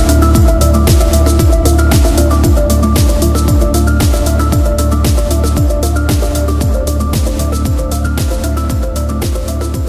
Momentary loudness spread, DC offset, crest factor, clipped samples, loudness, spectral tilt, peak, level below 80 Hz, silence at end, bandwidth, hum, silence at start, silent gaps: 6 LU; under 0.1%; 10 dB; under 0.1%; -12 LUFS; -6 dB/octave; 0 dBFS; -12 dBFS; 0 s; 16 kHz; none; 0 s; none